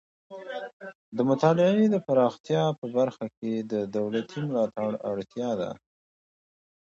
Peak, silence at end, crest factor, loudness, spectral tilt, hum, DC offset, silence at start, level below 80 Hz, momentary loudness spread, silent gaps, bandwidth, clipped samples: -8 dBFS; 1.1 s; 20 dB; -27 LUFS; -7.5 dB/octave; none; under 0.1%; 0.3 s; -70 dBFS; 16 LU; 0.73-0.80 s, 0.95-1.12 s, 2.40-2.44 s, 2.78-2.82 s, 3.37-3.42 s; 7.6 kHz; under 0.1%